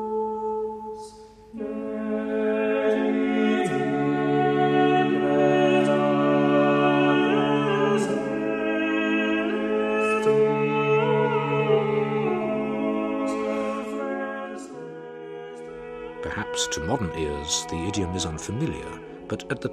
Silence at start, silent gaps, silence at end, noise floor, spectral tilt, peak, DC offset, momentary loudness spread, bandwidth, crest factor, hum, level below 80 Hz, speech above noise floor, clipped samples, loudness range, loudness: 0 s; none; 0 s; -45 dBFS; -5.5 dB/octave; -10 dBFS; under 0.1%; 17 LU; 12 kHz; 14 dB; none; -52 dBFS; 17 dB; under 0.1%; 9 LU; -24 LUFS